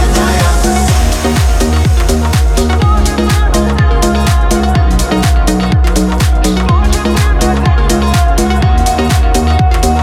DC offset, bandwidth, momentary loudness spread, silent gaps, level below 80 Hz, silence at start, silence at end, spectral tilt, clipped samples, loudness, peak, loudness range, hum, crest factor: under 0.1%; 15.5 kHz; 1 LU; none; -12 dBFS; 0 s; 0 s; -5.5 dB/octave; under 0.1%; -11 LUFS; 0 dBFS; 0 LU; none; 8 dB